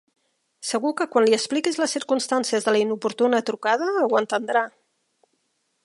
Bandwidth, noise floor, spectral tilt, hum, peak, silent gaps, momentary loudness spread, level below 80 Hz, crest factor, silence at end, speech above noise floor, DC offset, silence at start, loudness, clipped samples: 11.5 kHz; -72 dBFS; -3 dB/octave; none; -6 dBFS; none; 5 LU; -78 dBFS; 18 dB; 1.15 s; 50 dB; under 0.1%; 0.6 s; -22 LUFS; under 0.1%